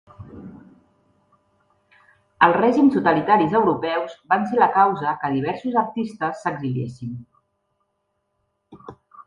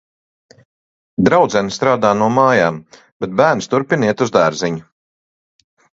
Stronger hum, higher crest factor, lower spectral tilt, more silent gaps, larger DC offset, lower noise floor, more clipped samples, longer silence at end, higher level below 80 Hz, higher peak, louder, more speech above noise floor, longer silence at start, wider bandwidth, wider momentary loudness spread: neither; first, 22 dB vs 16 dB; first, -7.5 dB/octave vs -5.5 dB/octave; second, none vs 3.12-3.20 s; neither; second, -73 dBFS vs under -90 dBFS; neither; second, 0.05 s vs 1.15 s; second, -60 dBFS vs -52 dBFS; about the same, 0 dBFS vs 0 dBFS; second, -20 LUFS vs -15 LUFS; second, 54 dB vs over 75 dB; second, 0.2 s vs 1.2 s; first, 9.8 kHz vs 7.8 kHz; first, 17 LU vs 11 LU